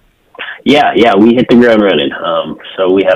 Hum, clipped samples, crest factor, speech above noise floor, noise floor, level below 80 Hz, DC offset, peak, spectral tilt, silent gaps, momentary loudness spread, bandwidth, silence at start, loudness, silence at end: none; 0.8%; 10 dB; 20 dB; -28 dBFS; -46 dBFS; under 0.1%; 0 dBFS; -6.5 dB/octave; none; 12 LU; 9.6 kHz; 0.4 s; -9 LUFS; 0 s